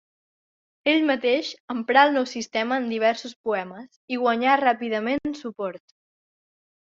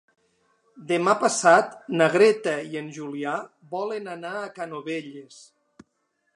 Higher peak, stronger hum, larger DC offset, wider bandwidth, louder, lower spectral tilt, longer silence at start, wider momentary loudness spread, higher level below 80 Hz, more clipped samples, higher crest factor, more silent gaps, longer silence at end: about the same, -4 dBFS vs -2 dBFS; neither; neither; second, 7.8 kHz vs 11.5 kHz; about the same, -23 LUFS vs -24 LUFS; about the same, -4 dB/octave vs -4 dB/octave; about the same, 0.85 s vs 0.75 s; second, 13 LU vs 16 LU; first, -68 dBFS vs -80 dBFS; neither; about the same, 22 dB vs 22 dB; first, 1.60-1.68 s, 3.36-3.44 s, 3.96-4.08 s vs none; about the same, 1.05 s vs 1.1 s